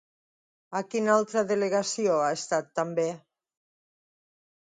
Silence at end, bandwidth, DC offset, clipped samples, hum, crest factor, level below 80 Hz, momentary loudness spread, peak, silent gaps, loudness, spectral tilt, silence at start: 1.5 s; 9.6 kHz; under 0.1%; under 0.1%; none; 20 dB; -80 dBFS; 9 LU; -8 dBFS; none; -27 LUFS; -4 dB/octave; 0.7 s